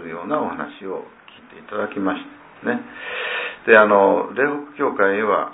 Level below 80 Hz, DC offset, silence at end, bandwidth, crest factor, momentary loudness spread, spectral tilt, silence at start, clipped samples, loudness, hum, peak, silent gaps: -66 dBFS; under 0.1%; 0 s; 4 kHz; 20 dB; 17 LU; -9 dB/octave; 0 s; under 0.1%; -19 LUFS; none; 0 dBFS; none